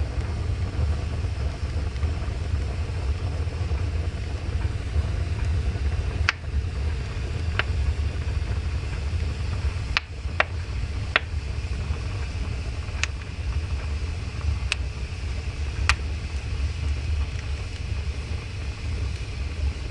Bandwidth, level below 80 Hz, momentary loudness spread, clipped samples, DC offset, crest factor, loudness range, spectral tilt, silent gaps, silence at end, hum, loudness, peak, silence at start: 11 kHz; -30 dBFS; 6 LU; under 0.1%; 0.2%; 26 dB; 2 LU; -5 dB/octave; none; 0 s; none; -28 LUFS; 0 dBFS; 0 s